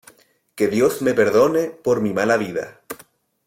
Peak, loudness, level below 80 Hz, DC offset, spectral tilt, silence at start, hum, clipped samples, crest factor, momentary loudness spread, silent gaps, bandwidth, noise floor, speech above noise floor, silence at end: -4 dBFS; -19 LUFS; -60 dBFS; under 0.1%; -5.5 dB/octave; 0.55 s; none; under 0.1%; 16 dB; 19 LU; none; 16.5 kHz; -52 dBFS; 34 dB; 0.5 s